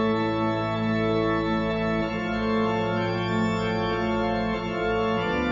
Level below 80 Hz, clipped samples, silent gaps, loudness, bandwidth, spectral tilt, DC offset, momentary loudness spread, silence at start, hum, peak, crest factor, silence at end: -44 dBFS; under 0.1%; none; -25 LUFS; 7.6 kHz; -7 dB/octave; under 0.1%; 2 LU; 0 s; none; -12 dBFS; 12 dB; 0 s